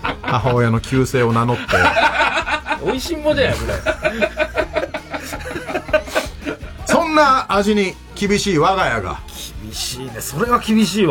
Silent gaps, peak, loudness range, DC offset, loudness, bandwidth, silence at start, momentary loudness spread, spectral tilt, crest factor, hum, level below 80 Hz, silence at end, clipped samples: none; 0 dBFS; 4 LU; under 0.1%; -18 LUFS; 17 kHz; 0 s; 13 LU; -5 dB/octave; 18 dB; none; -36 dBFS; 0 s; under 0.1%